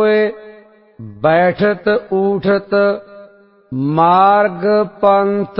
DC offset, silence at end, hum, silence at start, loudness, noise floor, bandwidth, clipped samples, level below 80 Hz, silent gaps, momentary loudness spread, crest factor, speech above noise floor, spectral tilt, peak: under 0.1%; 0 s; none; 0 s; -14 LUFS; -44 dBFS; 5.6 kHz; under 0.1%; -54 dBFS; none; 9 LU; 14 dB; 30 dB; -10.5 dB/octave; 0 dBFS